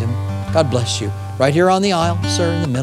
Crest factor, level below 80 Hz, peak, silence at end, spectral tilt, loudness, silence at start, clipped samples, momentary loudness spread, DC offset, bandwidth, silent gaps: 16 dB; -44 dBFS; 0 dBFS; 0 s; -5.5 dB/octave; -17 LUFS; 0 s; under 0.1%; 8 LU; under 0.1%; 13 kHz; none